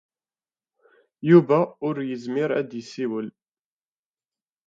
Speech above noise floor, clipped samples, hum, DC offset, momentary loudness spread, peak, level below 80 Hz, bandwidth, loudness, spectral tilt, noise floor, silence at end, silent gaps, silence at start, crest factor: over 68 dB; under 0.1%; none; under 0.1%; 15 LU; -2 dBFS; -76 dBFS; 7.4 kHz; -23 LUFS; -8.5 dB/octave; under -90 dBFS; 1.35 s; none; 1.25 s; 22 dB